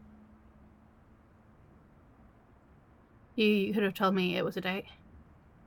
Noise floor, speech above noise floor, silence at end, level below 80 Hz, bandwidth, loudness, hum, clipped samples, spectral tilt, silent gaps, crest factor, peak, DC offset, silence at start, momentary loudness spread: -60 dBFS; 30 dB; 0.5 s; -64 dBFS; 17.5 kHz; -30 LUFS; none; under 0.1%; -6.5 dB/octave; none; 20 dB; -16 dBFS; under 0.1%; 3.35 s; 12 LU